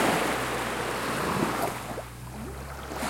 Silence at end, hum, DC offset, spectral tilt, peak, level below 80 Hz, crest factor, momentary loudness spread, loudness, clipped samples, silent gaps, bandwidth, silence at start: 0 s; none; under 0.1%; -4 dB/octave; -12 dBFS; -46 dBFS; 18 dB; 12 LU; -30 LUFS; under 0.1%; none; 16.5 kHz; 0 s